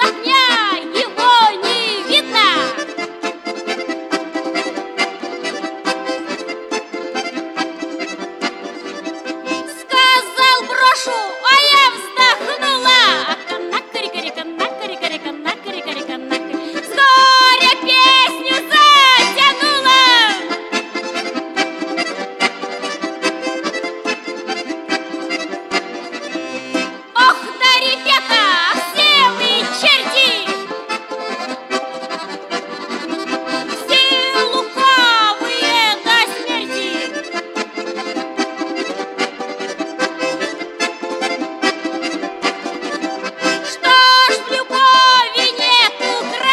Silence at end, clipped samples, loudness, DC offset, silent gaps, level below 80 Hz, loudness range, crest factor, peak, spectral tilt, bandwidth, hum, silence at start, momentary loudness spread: 0 s; under 0.1%; -14 LUFS; under 0.1%; none; -72 dBFS; 12 LU; 16 dB; 0 dBFS; -1 dB/octave; 15 kHz; none; 0 s; 15 LU